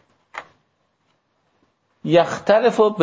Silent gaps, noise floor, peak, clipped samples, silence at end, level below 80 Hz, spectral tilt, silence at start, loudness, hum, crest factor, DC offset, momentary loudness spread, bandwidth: none; -67 dBFS; -2 dBFS; under 0.1%; 0 s; -64 dBFS; -6 dB/octave; 0.35 s; -17 LUFS; none; 18 dB; under 0.1%; 21 LU; 8 kHz